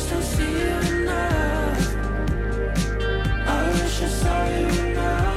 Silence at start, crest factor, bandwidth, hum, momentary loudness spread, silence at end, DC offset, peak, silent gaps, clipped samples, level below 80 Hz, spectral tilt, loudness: 0 s; 14 dB; 15 kHz; none; 3 LU; 0 s; under 0.1%; -8 dBFS; none; under 0.1%; -26 dBFS; -5.5 dB/octave; -23 LUFS